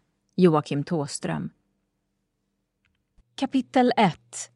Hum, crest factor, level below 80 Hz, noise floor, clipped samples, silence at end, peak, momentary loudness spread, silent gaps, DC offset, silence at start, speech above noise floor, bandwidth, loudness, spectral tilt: none; 20 dB; -66 dBFS; -77 dBFS; under 0.1%; 0.1 s; -6 dBFS; 15 LU; none; under 0.1%; 0.4 s; 53 dB; 11.5 kHz; -24 LUFS; -6 dB/octave